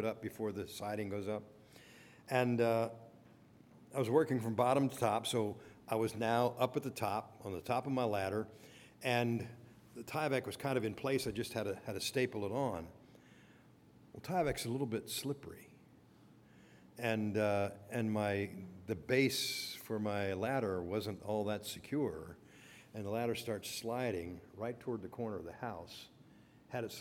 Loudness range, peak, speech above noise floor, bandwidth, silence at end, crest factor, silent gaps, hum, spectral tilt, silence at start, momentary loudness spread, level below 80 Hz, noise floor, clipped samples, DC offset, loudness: 6 LU; -18 dBFS; 26 dB; 18.5 kHz; 0 s; 22 dB; none; none; -5 dB/octave; 0 s; 18 LU; -70 dBFS; -63 dBFS; under 0.1%; under 0.1%; -38 LUFS